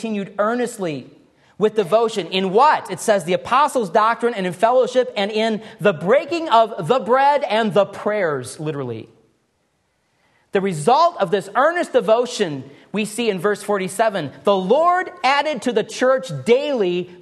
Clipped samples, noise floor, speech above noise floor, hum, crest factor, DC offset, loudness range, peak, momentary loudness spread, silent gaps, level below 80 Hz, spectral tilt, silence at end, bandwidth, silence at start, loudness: under 0.1%; -67 dBFS; 48 dB; none; 16 dB; under 0.1%; 4 LU; -2 dBFS; 9 LU; none; -68 dBFS; -4.5 dB/octave; 0.05 s; 12.5 kHz; 0 s; -19 LUFS